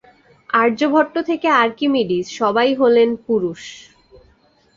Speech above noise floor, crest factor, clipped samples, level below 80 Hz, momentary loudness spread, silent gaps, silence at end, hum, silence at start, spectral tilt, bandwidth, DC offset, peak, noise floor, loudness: 39 dB; 16 dB; under 0.1%; -60 dBFS; 7 LU; none; 0.95 s; none; 0.55 s; -5 dB/octave; 7.6 kHz; under 0.1%; -2 dBFS; -56 dBFS; -17 LUFS